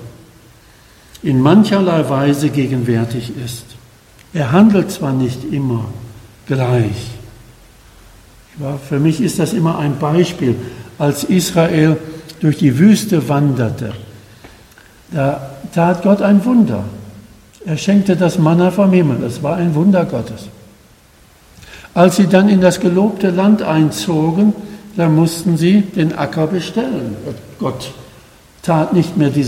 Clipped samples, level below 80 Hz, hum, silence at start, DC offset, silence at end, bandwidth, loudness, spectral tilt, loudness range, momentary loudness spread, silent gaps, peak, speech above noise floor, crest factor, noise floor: under 0.1%; -46 dBFS; none; 0 s; under 0.1%; 0 s; 16 kHz; -14 LUFS; -7 dB/octave; 6 LU; 15 LU; none; 0 dBFS; 33 dB; 14 dB; -46 dBFS